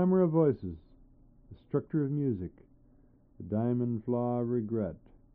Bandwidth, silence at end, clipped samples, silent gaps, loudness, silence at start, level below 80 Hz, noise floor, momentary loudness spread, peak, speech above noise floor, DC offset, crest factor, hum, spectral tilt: 3.6 kHz; 0.4 s; under 0.1%; none; -31 LUFS; 0 s; -60 dBFS; -61 dBFS; 17 LU; -14 dBFS; 31 dB; under 0.1%; 18 dB; none; -12 dB/octave